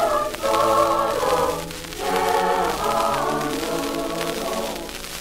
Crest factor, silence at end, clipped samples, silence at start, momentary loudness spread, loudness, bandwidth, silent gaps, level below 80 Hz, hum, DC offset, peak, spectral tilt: 18 dB; 0 s; under 0.1%; 0 s; 10 LU; -22 LUFS; 16.5 kHz; none; -42 dBFS; none; under 0.1%; -4 dBFS; -3.5 dB/octave